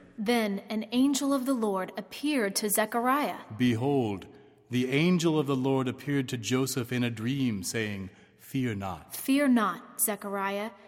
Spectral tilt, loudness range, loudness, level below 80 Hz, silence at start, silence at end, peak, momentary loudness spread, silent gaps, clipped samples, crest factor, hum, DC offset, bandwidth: -5 dB/octave; 3 LU; -29 LUFS; -68 dBFS; 0.2 s; 0.1 s; -12 dBFS; 9 LU; none; under 0.1%; 18 dB; none; under 0.1%; 16.5 kHz